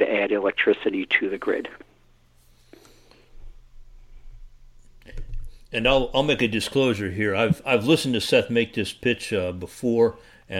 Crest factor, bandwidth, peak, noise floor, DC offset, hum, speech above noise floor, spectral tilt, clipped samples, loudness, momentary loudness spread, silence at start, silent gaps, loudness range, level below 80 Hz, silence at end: 20 dB; 16.5 kHz; -4 dBFS; -57 dBFS; under 0.1%; none; 34 dB; -5 dB/octave; under 0.1%; -23 LUFS; 10 LU; 0 s; none; 8 LU; -42 dBFS; 0 s